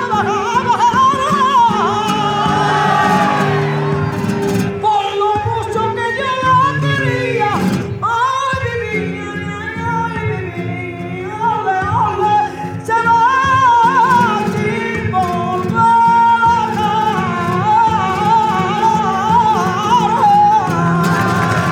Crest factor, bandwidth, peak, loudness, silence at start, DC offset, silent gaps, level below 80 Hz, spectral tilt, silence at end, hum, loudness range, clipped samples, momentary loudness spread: 12 dB; 18 kHz; -2 dBFS; -14 LUFS; 0 s; under 0.1%; none; -44 dBFS; -5.5 dB/octave; 0 s; none; 5 LU; under 0.1%; 8 LU